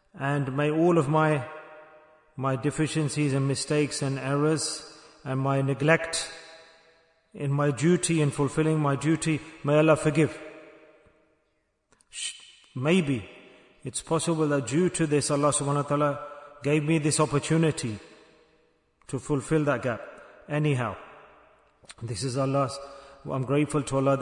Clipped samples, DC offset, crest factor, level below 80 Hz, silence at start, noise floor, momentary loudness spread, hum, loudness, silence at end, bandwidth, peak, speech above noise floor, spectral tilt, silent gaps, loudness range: under 0.1%; under 0.1%; 20 dB; -60 dBFS; 0.15 s; -73 dBFS; 17 LU; none; -26 LUFS; 0 s; 11 kHz; -6 dBFS; 48 dB; -5.5 dB/octave; none; 6 LU